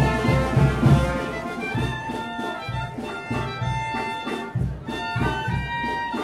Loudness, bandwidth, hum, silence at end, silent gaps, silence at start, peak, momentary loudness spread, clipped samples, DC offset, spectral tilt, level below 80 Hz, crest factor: -25 LUFS; 13 kHz; none; 0 s; none; 0 s; -6 dBFS; 10 LU; under 0.1%; under 0.1%; -6.5 dB/octave; -34 dBFS; 18 dB